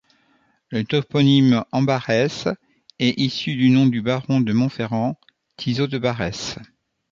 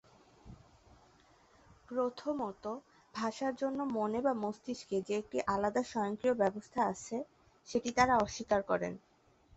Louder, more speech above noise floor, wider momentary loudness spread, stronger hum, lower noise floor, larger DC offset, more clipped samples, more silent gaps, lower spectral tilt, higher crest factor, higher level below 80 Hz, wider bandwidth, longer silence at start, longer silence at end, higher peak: first, -20 LUFS vs -35 LUFS; first, 43 dB vs 32 dB; about the same, 13 LU vs 11 LU; neither; second, -62 dBFS vs -66 dBFS; neither; neither; neither; first, -6.5 dB/octave vs -4 dB/octave; about the same, 18 dB vs 22 dB; first, -54 dBFS vs -64 dBFS; about the same, 7.6 kHz vs 8 kHz; first, 0.7 s vs 0.45 s; second, 0.45 s vs 0.6 s; first, -4 dBFS vs -14 dBFS